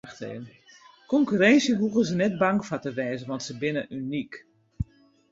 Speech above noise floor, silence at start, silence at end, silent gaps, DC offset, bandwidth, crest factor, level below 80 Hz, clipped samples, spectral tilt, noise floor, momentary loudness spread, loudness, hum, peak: 27 dB; 0.05 s; 0.5 s; none; under 0.1%; 8 kHz; 20 dB; -52 dBFS; under 0.1%; -5.5 dB/octave; -52 dBFS; 19 LU; -25 LUFS; none; -8 dBFS